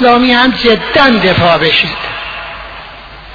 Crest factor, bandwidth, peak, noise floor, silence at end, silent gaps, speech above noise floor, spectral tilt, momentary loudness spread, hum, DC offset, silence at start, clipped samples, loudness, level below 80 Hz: 10 dB; 5.4 kHz; 0 dBFS; -30 dBFS; 0 s; none; 22 dB; -6 dB/octave; 20 LU; none; under 0.1%; 0 s; 0.2%; -9 LUFS; -34 dBFS